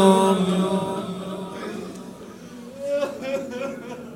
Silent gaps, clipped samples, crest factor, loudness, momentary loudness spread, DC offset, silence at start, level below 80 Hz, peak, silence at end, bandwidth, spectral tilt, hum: none; under 0.1%; 22 dB; -25 LUFS; 20 LU; under 0.1%; 0 s; -62 dBFS; -2 dBFS; 0 s; 16 kHz; -6 dB/octave; none